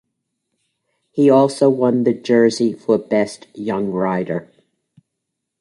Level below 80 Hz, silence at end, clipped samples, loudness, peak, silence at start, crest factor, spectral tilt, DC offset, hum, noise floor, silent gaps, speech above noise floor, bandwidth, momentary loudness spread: -62 dBFS; 1.15 s; under 0.1%; -17 LUFS; -2 dBFS; 1.15 s; 16 dB; -6.5 dB/octave; under 0.1%; none; -78 dBFS; none; 62 dB; 11.5 kHz; 12 LU